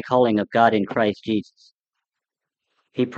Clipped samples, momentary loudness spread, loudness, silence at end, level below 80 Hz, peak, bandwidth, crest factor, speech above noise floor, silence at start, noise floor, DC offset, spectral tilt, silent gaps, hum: under 0.1%; 9 LU; -21 LUFS; 0 s; -68 dBFS; -2 dBFS; 7.6 kHz; 22 dB; 66 dB; 0.05 s; -86 dBFS; under 0.1%; -7.5 dB/octave; 1.74-1.84 s; none